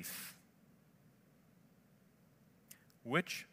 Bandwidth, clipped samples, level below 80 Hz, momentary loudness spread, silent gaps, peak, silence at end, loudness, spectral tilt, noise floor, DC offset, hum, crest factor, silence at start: 16 kHz; under 0.1%; -86 dBFS; 24 LU; none; -18 dBFS; 0.05 s; -40 LUFS; -4 dB/octave; -68 dBFS; under 0.1%; none; 28 dB; 0 s